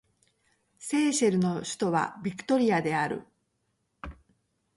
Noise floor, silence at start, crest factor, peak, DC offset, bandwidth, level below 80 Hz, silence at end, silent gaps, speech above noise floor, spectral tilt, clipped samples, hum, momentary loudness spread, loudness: -76 dBFS; 0.8 s; 16 dB; -14 dBFS; under 0.1%; 11.5 kHz; -58 dBFS; 0.65 s; none; 50 dB; -5 dB/octave; under 0.1%; none; 21 LU; -27 LUFS